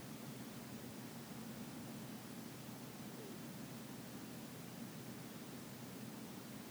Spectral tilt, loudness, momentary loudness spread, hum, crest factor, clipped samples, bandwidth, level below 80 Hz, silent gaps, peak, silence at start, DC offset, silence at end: -4.5 dB/octave; -51 LUFS; 1 LU; none; 12 dB; under 0.1%; over 20 kHz; -78 dBFS; none; -38 dBFS; 0 s; under 0.1%; 0 s